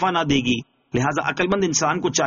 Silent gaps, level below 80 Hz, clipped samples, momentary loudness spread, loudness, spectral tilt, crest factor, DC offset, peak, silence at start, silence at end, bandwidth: none; -48 dBFS; under 0.1%; 5 LU; -21 LUFS; -3.5 dB/octave; 14 dB; under 0.1%; -6 dBFS; 0 s; 0 s; 7.4 kHz